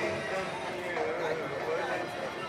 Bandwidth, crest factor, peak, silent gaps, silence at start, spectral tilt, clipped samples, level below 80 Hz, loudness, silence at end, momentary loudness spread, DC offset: 15.5 kHz; 14 dB; -20 dBFS; none; 0 s; -4.5 dB/octave; under 0.1%; -64 dBFS; -33 LUFS; 0 s; 3 LU; under 0.1%